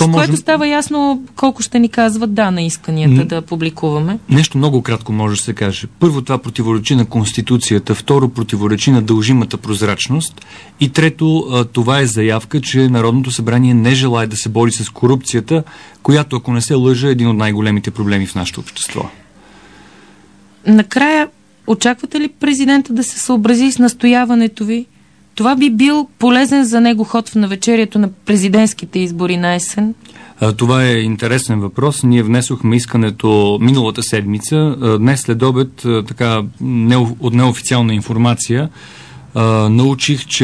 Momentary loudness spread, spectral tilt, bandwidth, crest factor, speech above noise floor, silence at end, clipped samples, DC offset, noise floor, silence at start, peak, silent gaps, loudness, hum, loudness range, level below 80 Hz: 7 LU; -5.5 dB/octave; 11 kHz; 12 dB; 32 dB; 0 s; under 0.1%; 0.2%; -45 dBFS; 0 s; 0 dBFS; none; -13 LUFS; none; 3 LU; -48 dBFS